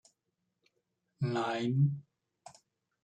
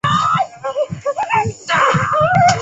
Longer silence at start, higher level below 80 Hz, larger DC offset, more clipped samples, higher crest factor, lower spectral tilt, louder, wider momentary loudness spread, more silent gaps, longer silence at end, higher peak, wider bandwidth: first, 1.2 s vs 0.05 s; second, -80 dBFS vs -44 dBFS; neither; neither; about the same, 18 dB vs 14 dB; first, -7.5 dB/octave vs -4.5 dB/octave; second, -33 LUFS vs -16 LUFS; about the same, 8 LU vs 9 LU; neither; first, 1.05 s vs 0 s; second, -18 dBFS vs -2 dBFS; about the same, 8.8 kHz vs 8.4 kHz